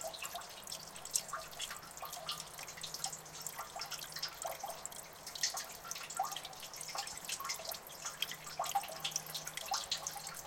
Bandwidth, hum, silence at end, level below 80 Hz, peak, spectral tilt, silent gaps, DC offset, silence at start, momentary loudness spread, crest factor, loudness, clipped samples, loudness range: 17 kHz; none; 0 s; -72 dBFS; -10 dBFS; 0 dB/octave; none; under 0.1%; 0 s; 8 LU; 32 dB; -41 LUFS; under 0.1%; 3 LU